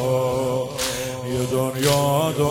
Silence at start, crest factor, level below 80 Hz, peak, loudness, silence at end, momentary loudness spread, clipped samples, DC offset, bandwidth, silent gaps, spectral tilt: 0 s; 16 dB; -48 dBFS; -6 dBFS; -22 LUFS; 0 s; 6 LU; under 0.1%; under 0.1%; 16.5 kHz; none; -4.5 dB/octave